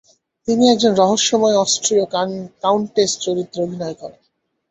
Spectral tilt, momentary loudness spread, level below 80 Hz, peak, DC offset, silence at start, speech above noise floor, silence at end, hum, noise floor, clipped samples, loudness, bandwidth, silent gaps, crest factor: -3.5 dB/octave; 14 LU; -60 dBFS; -2 dBFS; under 0.1%; 0.45 s; 51 dB; 0.6 s; none; -68 dBFS; under 0.1%; -17 LUFS; 8.4 kHz; none; 16 dB